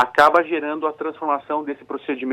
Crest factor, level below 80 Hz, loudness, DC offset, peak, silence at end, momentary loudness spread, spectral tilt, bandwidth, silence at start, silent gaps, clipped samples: 18 dB; -64 dBFS; -21 LUFS; under 0.1%; -2 dBFS; 0 s; 13 LU; -4.5 dB/octave; 16 kHz; 0 s; none; under 0.1%